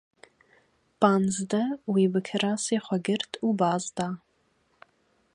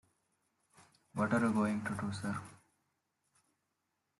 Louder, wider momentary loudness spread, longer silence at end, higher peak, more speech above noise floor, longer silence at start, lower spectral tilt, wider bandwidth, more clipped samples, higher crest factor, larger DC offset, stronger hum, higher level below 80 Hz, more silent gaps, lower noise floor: first, -27 LUFS vs -36 LUFS; second, 8 LU vs 14 LU; second, 1.15 s vs 1.65 s; first, -6 dBFS vs -20 dBFS; second, 43 dB vs 50 dB; second, 1 s vs 1.15 s; second, -5 dB/octave vs -6.5 dB/octave; about the same, 11 kHz vs 12 kHz; neither; about the same, 22 dB vs 20 dB; neither; neither; about the same, -70 dBFS vs -72 dBFS; neither; second, -69 dBFS vs -84 dBFS